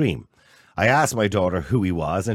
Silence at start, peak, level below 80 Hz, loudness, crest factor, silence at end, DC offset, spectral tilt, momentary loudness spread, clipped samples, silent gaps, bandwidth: 0 s; -4 dBFS; -44 dBFS; -21 LUFS; 18 dB; 0 s; under 0.1%; -5.5 dB/octave; 9 LU; under 0.1%; none; 16.5 kHz